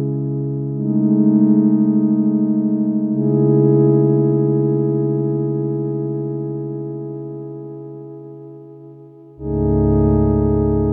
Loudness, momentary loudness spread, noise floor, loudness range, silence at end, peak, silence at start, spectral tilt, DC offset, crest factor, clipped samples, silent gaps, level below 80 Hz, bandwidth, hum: -17 LUFS; 18 LU; -40 dBFS; 12 LU; 0 s; -2 dBFS; 0 s; -15.5 dB/octave; under 0.1%; 14 dB; under 0.1%; none; -34 dBFS; 2.1 kHz; none